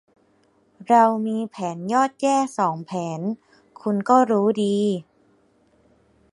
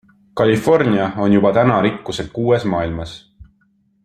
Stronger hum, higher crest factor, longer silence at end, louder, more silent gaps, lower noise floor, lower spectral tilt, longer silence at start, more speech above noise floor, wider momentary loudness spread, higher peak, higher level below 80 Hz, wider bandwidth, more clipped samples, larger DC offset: neither; about the same, 20 dB vs 16 dB; first, 1.3 s vs 0.6 s; second, -21 LUFS vs -16 LUFS; neither; about the same, -61 dBFS vs -60 dBFS; about the same, -6 dB/octave vs -7 dB/octave; first, 0.8 s vs 0.35 s; about the same, 41 dB vs 44 dB; about the same, 12 LU vs 12 LU; about the same, -2 dBFS vs -2 dBFS; second, -70 dBFS vs -46 dBFS; second, 11.5 kHz vs 14 kHz; neither; neither